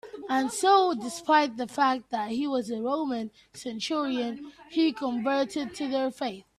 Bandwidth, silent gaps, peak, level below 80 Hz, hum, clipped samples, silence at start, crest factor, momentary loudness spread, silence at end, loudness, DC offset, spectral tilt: 14 kHz; none; -8 dBFS; -70 dBFS; none; under 0.1%; 0.05 s; 18 dB; 12 LU; 0.15 s; -27 LUFS; under 0.1%; -3.5 dB/octave